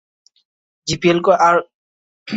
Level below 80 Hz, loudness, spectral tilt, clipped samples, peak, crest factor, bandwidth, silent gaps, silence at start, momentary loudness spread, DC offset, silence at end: -52 dBFS; -15 LUFS; -5 dB/octave; under 0.1%; -2 dBFS; 16 dB; 8 kHz; 1.74-2.26 s; 0.85 s; 11 LU; under 0.1%; 0 s